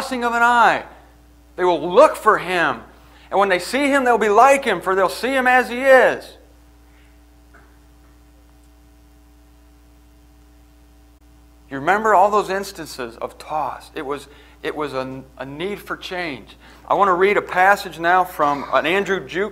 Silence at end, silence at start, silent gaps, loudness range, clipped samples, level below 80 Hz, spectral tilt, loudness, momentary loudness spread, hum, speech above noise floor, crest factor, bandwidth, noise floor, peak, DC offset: 0 s; 0 s; none; 12 LU; under 0.1%; -50 dBFS; -4 dB/octave; -17 LUFS; 17 LU; none; 31 dB; 20 dB; 16 kHz; -49 dBFS; 0 dBFS; under 0.1%